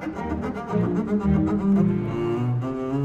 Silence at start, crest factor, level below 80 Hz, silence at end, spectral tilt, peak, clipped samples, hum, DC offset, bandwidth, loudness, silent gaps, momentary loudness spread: 0 s; 14 dB; -40 dBFS; 0 s; -9.5 dB/octave; -8 dBFS; under 0.1%; none; under 0.1%; 7.8 kHz; -24 LUFS; none; 8 LU